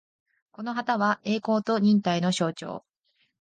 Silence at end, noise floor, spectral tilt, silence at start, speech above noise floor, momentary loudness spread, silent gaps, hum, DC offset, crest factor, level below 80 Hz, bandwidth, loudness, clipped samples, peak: 0.6 s; -72 dBFS; -5.5 dB/octave; 0.6 s; 47 dB; 15 LU; none; none; under 0.1%; 14 dB; -72 dBFS; 9.4 kHz; -25 LUFS; under 0.1%; -12 dBFS